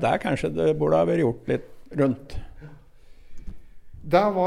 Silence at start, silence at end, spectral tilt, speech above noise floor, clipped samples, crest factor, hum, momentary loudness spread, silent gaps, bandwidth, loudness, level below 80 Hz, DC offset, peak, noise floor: 0 s; 0 s; -7.5 dB/octave; 24 dB; under 0.1%; 18 dB; none; 20 LU; none; 15 kHz; -24 LUFS; -44 dBFS; under 0.1%; -6 dBFS; -46 dBFS